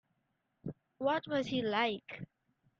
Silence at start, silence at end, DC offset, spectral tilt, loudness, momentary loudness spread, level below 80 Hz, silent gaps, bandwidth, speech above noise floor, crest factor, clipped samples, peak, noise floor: 0.65 s; 0.55 s; under 0.1%; -6 dB/octave; -34 LUFS; 16 LU; -74 dBFS; none; 7.6 kHz; 47 dB; 20 dB; under 0.1%; -18 dBFS; -81 dBFS